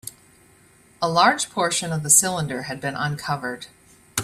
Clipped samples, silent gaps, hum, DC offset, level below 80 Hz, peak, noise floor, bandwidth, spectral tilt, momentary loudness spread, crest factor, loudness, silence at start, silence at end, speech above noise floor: under 0.1%; none; none; under 0.1%; -58 dBFS; -2 dBFS; -54 dBFS; 15.5 kHz; -2.5 dB/octave; 16 LU; 22 dB; -21 LUFS; 0.05 s; 0 s; 32 dB